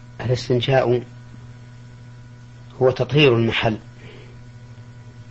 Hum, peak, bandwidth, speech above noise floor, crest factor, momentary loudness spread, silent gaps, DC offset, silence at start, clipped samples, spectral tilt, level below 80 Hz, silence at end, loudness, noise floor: none; -4 dBFS; 8 kHz; 23 dB; 18 dB; 26 LU; none; under 0.1%; 0 s; under 0.1%; -6.5 dB/octave; -48 dBFS; 0 s; -19 LUFS; -41 dBFS